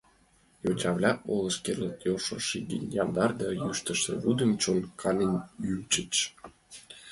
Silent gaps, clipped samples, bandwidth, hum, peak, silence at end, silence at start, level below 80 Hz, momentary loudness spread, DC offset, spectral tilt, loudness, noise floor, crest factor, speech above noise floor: none; under 0.1%; 11.5 kHz; none; -10 dBFS; 0 s; 0.65 s; -60 dBFS; 8 LU; under 0.1%; -4 dB/octave; -29 LUFS; -64 dBFS; 20 dB; 34 dB